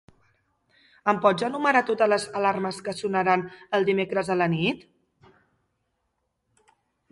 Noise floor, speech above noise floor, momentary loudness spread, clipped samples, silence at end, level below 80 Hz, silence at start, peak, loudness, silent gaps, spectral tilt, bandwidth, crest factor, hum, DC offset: -76 dBFS; 53 dB; 7 LU; under 0.1%; 2.35 s; -66 dBFS; 1.05 s; -6 dBFS; -24 LUFS; none; -5.5 dB/octave; 11.5 kHz; 20 dB; none; under 0.1%